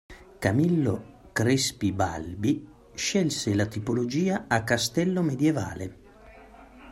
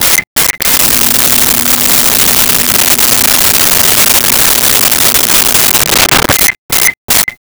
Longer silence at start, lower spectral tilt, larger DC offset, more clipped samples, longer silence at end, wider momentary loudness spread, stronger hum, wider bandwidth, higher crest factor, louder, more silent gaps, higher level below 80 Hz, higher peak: about the same, 0.1 s vs 0 s; first, -5 dB/octave vs -0.5 dB/octave; neither; neither; about the same, 0 s vs 0.1 s; first, 8 LU vs 3 LU; neither; second, 16 kHz vs over 20 kHz; first, 18 dB vs 8 dB; second, -26 LUFS vs -5 LUFS; second, none vs 0.27-0.36 s, 6.59-6.69 s, 6.97-7.08 s; second, -54 dBFS vs -32 dBFS; second, -8 dBFS vs 0 dBFS